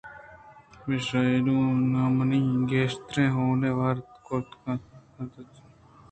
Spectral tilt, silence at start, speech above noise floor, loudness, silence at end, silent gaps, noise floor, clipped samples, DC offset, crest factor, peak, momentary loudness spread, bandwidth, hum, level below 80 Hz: -7.5 dB/octave; 0.05 s; 28 dB; -26 LUFS; 0.65 s; none; -53 dBFS; under 0.1%; under 0.1%; 16 dB; -10 dBFS; 17 LU; 8.8 kHz; none; -58 dBFS